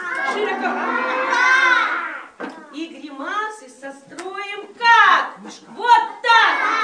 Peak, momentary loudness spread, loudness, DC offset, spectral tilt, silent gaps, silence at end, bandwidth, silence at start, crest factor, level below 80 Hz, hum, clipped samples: -2 dBFS; 21 LU; -16 LUFS; under 0.1%; -1 dB/octave; none; 0 s; 10 kHz; 0 s; 18 dB; -80 dBFS; none; under 0.1%